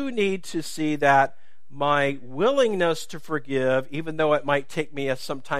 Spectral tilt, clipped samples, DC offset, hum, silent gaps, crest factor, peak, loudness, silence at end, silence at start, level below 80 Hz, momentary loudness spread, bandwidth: -5 dB/octave; under 0.1%; 2%; none; none; 20 dB; -4 dBFS; -24 LUFS; 0 s; 0 s; -66 dBFS; 11 LU; 15.5 kHz